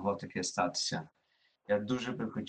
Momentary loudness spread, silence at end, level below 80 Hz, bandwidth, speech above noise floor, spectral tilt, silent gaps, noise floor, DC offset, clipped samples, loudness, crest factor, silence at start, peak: 6 LU; 0 s; -70 dBFS; 9.4 kHz; 40 dB; -4 dB/octave; none; -74 dBFS; under 0.1%; under 0.1%; -34 LUFS; 18 dB; 0 s; -16 dBFS